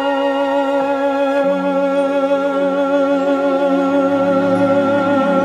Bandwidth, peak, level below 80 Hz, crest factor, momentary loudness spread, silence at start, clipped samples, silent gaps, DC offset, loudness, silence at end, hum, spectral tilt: 11 kHz; -4 dBFS; -60 dBFS; 10 dB; 2 LU; 0 s; under 0.1%; none; under 0.1%; -16 LUFS; 0 s; none; -7 dB/octave